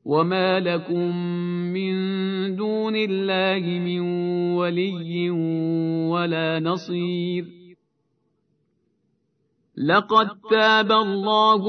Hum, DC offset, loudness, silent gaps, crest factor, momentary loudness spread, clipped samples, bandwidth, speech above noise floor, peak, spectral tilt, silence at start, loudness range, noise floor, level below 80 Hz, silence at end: none; under 0.1%; -22 LUFS; none; 18 dB; 9 LU; under 0.1%; 6.4 kHz; 49 dB; -4 dBFS; -7 dB/octave; 0.05 s; 6 LU; -71 dBFS; -76 dBFS; 0 s